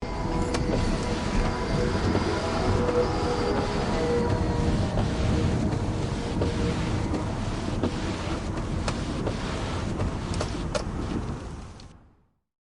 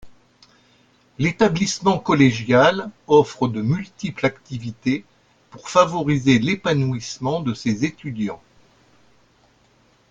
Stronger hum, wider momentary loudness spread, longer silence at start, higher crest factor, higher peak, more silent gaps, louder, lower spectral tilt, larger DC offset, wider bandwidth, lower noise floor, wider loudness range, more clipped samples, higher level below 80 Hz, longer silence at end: neither; second, 6 LU vs 12 LU; about the same, 0 s vs 0.05 s; about the same, 16 dB vs 20 dB; second, -12 dBFS vs 0 dBFS; neither; second, -28 LUFS vs -20 LUFS; about the same, -6 dB/octave vs -5.5 dB/octave; neither; first, 11.5 kHz vs 9.2 kHz; about the same, -61 dBFS vs -58 dBFS; about the same, 5 LU vs 6 LU; neither; first, -34 dBFS vs -54 dBFS; second, 0.65 s vs 1.75 s